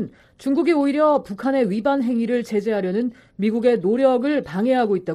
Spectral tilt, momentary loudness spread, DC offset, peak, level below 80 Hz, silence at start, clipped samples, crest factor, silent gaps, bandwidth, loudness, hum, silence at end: -7.5 dB/octave; 6 LU; under 0.1%; -6 dBFS; -60 dBFS; 0 s; under 0.1%; 14 dB; none; 12.5 kHz; -20 LUFS; none; 0 s